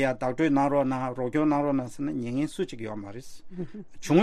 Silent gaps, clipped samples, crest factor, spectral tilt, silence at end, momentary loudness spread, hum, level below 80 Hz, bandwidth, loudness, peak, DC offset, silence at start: none; under 0.1%; 18 dB; -7 dB/octave; 0 s; 16 LU; none; -54 dBFS; 13 kHz; -27 LUFS; -8 dBFS; under 0.1%; 0 s